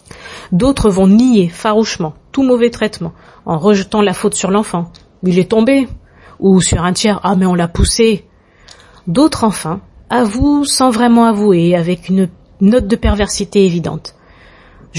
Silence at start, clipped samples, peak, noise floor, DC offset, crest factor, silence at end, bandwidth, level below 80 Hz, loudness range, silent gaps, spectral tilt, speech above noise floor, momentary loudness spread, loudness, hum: 0.15 s; under 0.1%; 0 dBFS; -43 dBFS; under 0.1%; 12 dB; 0 s; 11.5 kHz; -30 dBFS; 3 LU; none; -5.5 dB/octave; 31 dB; 12 LU; -13 LUFS; none